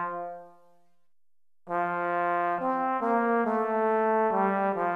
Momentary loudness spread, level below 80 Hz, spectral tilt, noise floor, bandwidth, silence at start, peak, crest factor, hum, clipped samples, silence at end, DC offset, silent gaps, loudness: 9 LU; -76 dBFS; -8.5 dB/octave; under -90 dBFS; 4.9 kHz; 0 s; -14 dBFS; 14 dB; none; under 0.1%; 0 s; under 0.1%; none; -27 LUFS